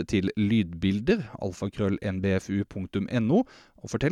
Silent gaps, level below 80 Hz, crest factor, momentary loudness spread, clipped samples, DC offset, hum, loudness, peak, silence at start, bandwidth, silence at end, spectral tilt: none; -52 dBFS; 14 dB; 9 LU; under 0.1%; under 0.1%; none; -28 LUFS; -12 dBFS; 0 s; 11 kHz; 0 s; -7 dB/octave